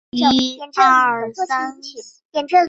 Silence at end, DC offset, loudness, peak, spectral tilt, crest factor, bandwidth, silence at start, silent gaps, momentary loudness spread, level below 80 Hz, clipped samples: 0 s; under 0.1%; -17 LUFS; -2 dBFS; -3 dB/octave; 16 dB; 8 kHz; 0.15 s; 2.25-2.30 s; 20 LU; -56 dBFS; under 0.1%